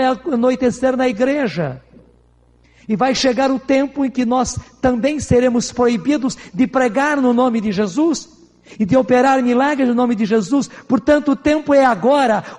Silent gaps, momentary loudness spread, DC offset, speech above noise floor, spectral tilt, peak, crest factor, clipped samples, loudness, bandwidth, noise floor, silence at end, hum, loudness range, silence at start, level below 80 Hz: none; 6 LU; under 0.1%; 37 dB; -5 dB/octave; -2 dBFS; 14 dB; under 0.1%; -16 LUFS; 10.5 kHz; -52 dBFS; 0 s; none; 4 LU; 0 s; -44 dBFS